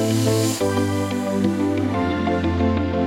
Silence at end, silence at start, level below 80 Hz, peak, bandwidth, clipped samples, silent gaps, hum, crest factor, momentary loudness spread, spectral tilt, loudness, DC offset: 0 s; 0 s; -46 dBFS; -6 dBFS; 17 kHz; under 0.1%; none; none; 14 dB; 3 LU; -6 dB/octave; -21 LUFS; under 0.1%